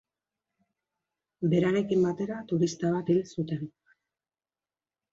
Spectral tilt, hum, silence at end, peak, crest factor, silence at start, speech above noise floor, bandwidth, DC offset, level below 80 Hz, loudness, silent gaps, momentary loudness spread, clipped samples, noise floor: -7 dB/octave; none; 1.45 s; -14 dBFS; 18 dB; 1.4 s; over 63 dB; 7.8 kHz; under 0.1%; -70 dBFS; -28 LUFS; none; 9 LU; under 0.1%; under -90 dBFS